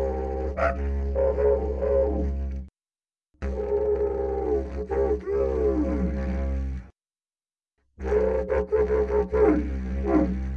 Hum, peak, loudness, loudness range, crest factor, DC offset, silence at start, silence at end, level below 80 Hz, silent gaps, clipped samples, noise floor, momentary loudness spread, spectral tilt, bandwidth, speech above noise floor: none; -8 dBFS; -26 LUFS; 3 LU; 18 dB; under 0.1%; 0 s; 0 s; -32 dBFS; none; under 0.1%; under -90 dBFS; 9 LU; -9.5 dB/octave; 6.6 kHz; over 67 dB